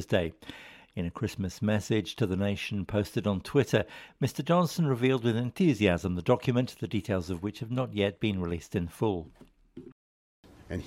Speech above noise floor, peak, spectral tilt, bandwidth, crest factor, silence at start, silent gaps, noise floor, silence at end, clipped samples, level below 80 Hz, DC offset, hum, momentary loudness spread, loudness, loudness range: over 61 dB; -8 dBFS; -6.5 dB/octave; 16 kHz; 20 dB; 0 s; 9.92-10.43 s; under -90 dBFS; 0 s; under 0.1%; -54 dBFS; under 0.1%; none; 11 LU; -30 LUFS; 5 LU